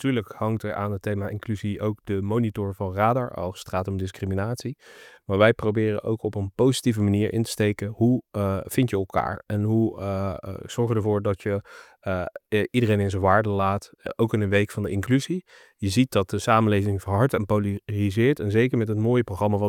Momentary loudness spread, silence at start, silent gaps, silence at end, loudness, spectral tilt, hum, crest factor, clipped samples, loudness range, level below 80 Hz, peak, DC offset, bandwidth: 9 LU; 0 s; none; 0 s; -24 LUFS; -7 dB/octave; none; 20 dB; under 0.1%; 4 LU; -56 dBFS; -4 dBFS; under 0.1%; 16.5 kHz